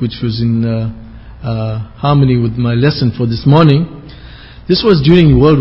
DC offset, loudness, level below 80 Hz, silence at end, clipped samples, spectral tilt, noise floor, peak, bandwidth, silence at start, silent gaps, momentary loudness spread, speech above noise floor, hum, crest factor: under 0.1%; -12 LUFS; -30 dBFS; 0 s; 0.4%; -9.5 dB/octave; -33 dBFS; 0 dBFS; 5.8 kHz; 0 s; none; 14 LU; 23 dB; none; 12 dB